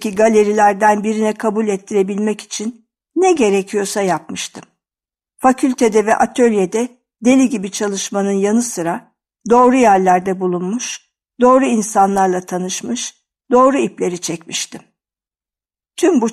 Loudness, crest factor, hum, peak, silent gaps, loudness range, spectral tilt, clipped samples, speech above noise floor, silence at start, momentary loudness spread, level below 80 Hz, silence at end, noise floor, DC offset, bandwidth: -15 LUFS; 14 dB; none; 0 dBFS; none; 4 LU; -4.5 dB/octave; under 0.1%; over 75 dB; 0 s; 12 LU; -56 dBFS; 0 s; under -90 dBFS; under 0.1%; 14 kHz